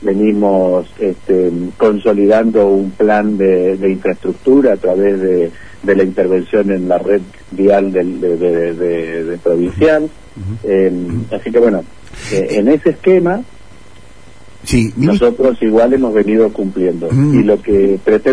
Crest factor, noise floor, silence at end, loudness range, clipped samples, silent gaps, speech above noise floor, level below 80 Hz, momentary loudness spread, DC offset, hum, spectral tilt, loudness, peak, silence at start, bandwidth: 12 dB; -41 dBFS; 0 s; 3 LU; under 0.1%; none; 28 dB; -38 dBFS; 8 LU; 2%; none; -7.5 dB/octave; -13 LUFS; 0 dBFS; 0 s; 11 kHz